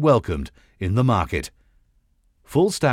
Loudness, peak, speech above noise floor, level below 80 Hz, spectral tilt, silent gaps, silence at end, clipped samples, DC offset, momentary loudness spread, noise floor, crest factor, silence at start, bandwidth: -22 LUFS; -6 dBFS; 42 dB; -42 dBFS; -6.5 dB/octave; none; 0 s; under 0.1%; under 0.1%; 13 LU; -62 dBFS; 16 dB; 0 s; 15.5 kHz